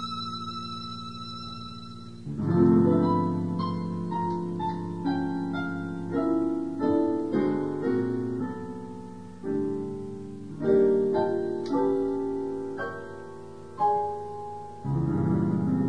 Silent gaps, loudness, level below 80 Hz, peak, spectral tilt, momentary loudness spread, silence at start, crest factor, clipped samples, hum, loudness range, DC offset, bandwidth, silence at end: none; -28 LUFS; -58 dBFS; -8 dBFS; -8.5 dB/octave; 16 LU; 0 s; 18 dB; under 0.1%; none; 4 LU; 0.4%; 10 kHz; 0 s